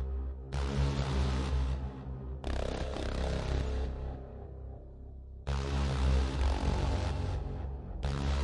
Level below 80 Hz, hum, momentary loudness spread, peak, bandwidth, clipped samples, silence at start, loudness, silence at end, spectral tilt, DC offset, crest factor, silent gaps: -36 dBFS; none; 14 LU; -18 dBFS; 10.5 kHz; under 0.1%; 0 s; -35 LUFS; 0 s; -6.5 dB/octave; under 0.1%; 16 dB; none